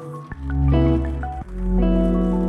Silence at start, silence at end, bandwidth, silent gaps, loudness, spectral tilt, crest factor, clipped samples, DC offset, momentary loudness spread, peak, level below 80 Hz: 0 s; 0 s; 4.9 kHz; none; -21 LUFS; -10 dB/octave; 14 dB; under 0.1%; under 0.1%; 12 LU; -6 dBFS; -24 dBFS